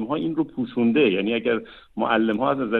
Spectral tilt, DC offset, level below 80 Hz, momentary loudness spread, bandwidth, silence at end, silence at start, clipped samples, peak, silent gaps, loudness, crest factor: -8.5 dB/octave; under 0.1%; -60 dBFS; 8 LU; 4.3 kHz; 0 s; 0 s; under 0.1%; -8 dBFS; none; -22 LUFS; 16 dB